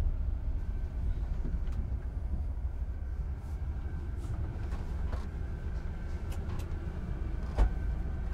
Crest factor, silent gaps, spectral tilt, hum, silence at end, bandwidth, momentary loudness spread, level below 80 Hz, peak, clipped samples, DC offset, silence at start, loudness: 18 dB; none; -8 dB/octave; none; 0 s; 8.2 kHz; 4 LU; -34 dBFS; -14 dBFS; under 0.1%; under 0.1%; 0 s; -38 LUFS